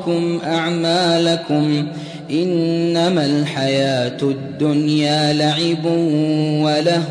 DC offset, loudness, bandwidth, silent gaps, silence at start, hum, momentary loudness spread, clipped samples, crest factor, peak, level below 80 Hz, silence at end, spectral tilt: under 0.1%; -17 LUFS; 10.5 kHz; none; 0 s; none; 5 LU; under 0.1%; 12 dB; -4 dBFS; -60 dBFS; 0 s; -6 dB/octave